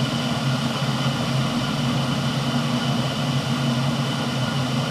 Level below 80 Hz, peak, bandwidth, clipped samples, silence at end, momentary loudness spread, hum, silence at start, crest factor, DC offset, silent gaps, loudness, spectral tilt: -50 dBFS; -10 dBFS; 15 kHz; under 0.1%; 0 s; 1 LU; none; 0 s; 12 dB; under 0.1%; none; -23 LUFS; -5.5 dB/octave